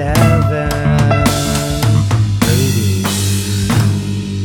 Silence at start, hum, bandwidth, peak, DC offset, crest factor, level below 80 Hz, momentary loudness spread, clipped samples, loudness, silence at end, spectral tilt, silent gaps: 0 s; none; 19.5 kHz; 0 dBFS; under 0.1%; 12 dB; -28 dBFS; 4 LU; under 0.1%; -14 LUFS; 0 s; -5.5 dB/octave; none